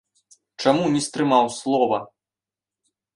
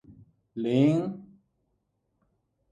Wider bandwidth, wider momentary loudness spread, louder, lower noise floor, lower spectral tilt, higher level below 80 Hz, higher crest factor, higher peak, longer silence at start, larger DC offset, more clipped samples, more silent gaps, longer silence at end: first, 11.5 kHz vs 9.4 kHz; second, 4 LU vs 20 LU; first, -21 LUFS vs -26 LUFS; first, under -90 dBFS vs -76 dBFS; second, -5 dB/octave vs -8.5 dB/octave; about the same, -66 dBFS vs -68 dBFS; about the same, 20 dB vs 20 dB; first, -2 dBFS vs -10 dBFS; first, 0.6 s vs 0.1 s; neither; neither; neither; second, 1.1 s vs 1.45 s